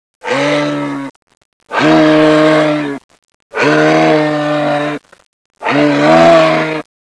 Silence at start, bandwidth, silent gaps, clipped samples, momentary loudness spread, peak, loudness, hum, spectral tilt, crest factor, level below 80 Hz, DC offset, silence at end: 0.25 s; 11 kHz; 1.16-1.27 s, 1.37-1.60 s, 3.04-3.09 s, 3.34-3.50 s, 5.26-5.50 s; under 0.1%; 14 LU; 0 dBFS; -11 LUFS; none; -5.5 dB/octave; 10 dB; -54 dBFS; under 0.1%; 0.2 s